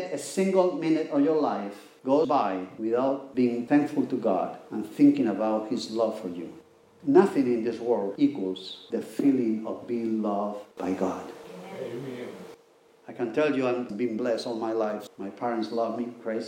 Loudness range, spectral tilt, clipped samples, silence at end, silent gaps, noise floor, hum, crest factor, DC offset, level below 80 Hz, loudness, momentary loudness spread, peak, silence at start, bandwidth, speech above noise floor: 6 LU; -6.5 dB/octave; under 0.1%; 0 s; none; -58 dBFS; none; 22 dB; under 0.1%; -78 dBFS; -27 LUFS; 14 LU; -6 dBFS; 0 s; 15.5 kHz; 32 dB